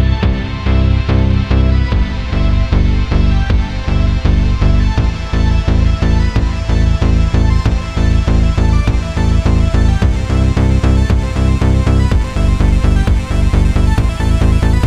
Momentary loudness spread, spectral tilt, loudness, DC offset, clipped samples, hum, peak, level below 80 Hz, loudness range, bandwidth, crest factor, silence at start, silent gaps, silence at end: 3 LU; -7 dB/octave; -14 LUFS; under 0.1%; under 0.1%; none; -2 dBFS; -14 dBFS; 1 LU; 9.6 kHz; 10 dB; 0 s; none; 0 s